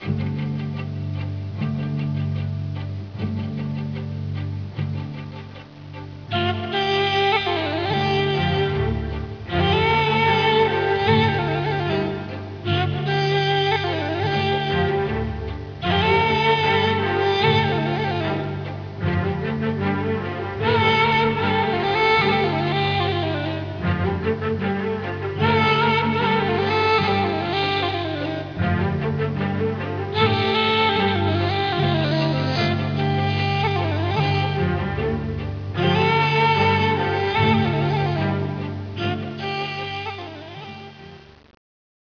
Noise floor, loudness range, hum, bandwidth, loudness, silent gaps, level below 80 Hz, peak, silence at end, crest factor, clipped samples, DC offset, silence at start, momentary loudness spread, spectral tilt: -43 dBFS; 8 LU; none; 5.4 kHz; -21 LUFS; none; -44 dBFS; -4 dBFS; 0.95 s; 18 dB; under 0.1%; under 0.1%; 0 s; 11 LU; -7 dB/octave